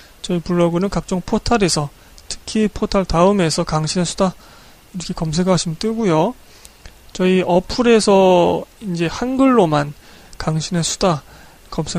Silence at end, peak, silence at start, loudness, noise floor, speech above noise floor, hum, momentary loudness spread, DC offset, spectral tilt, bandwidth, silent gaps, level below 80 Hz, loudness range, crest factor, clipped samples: 0 s; -2 dBFS; 0.25 s; -17 LUFS; -41 dBFS; 25 dB; none; 13 LU; under 0.1%; -5.5 dB/octave; 15 kHz; none; -36 dBFS; 4 LU; 16 dB; under 0.1%